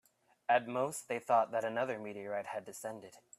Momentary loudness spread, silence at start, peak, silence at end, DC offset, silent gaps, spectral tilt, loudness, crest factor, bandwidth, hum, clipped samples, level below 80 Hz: 13 LU; 0.5 s; -16 dBFS; 0.2 s; under 0.1%; none; -4 dB/octave; -36 LUFS; 20 dB; 15 kHz; none; under 0.1%; -84 dBFS